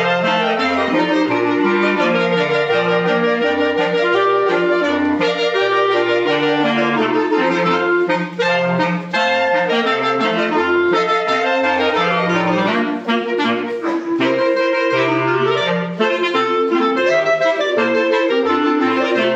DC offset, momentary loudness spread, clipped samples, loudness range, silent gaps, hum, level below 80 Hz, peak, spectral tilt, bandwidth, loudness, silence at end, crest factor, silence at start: under 0.1%; 3 LU; under 0.1%; 1 LU; none; none; -70 dBFS; -4 dBFS; -5.5 dB/octave; 8.2 kHz; -16 LUFS; 0 s; 12 dB; 0 s